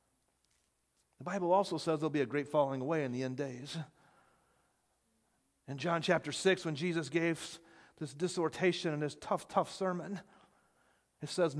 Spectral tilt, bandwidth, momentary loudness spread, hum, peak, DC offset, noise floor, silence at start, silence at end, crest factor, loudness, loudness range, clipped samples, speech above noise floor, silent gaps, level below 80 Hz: -5 dB/octave; 11 kHz; 15 LU; none; -14 dBFS; under 0.1%; -77 dBFS; 1.2 s; 0 s; 22 dB; -35 LUFS; 5 LU; under 0.1%; 43 dB; none; -78 dBFS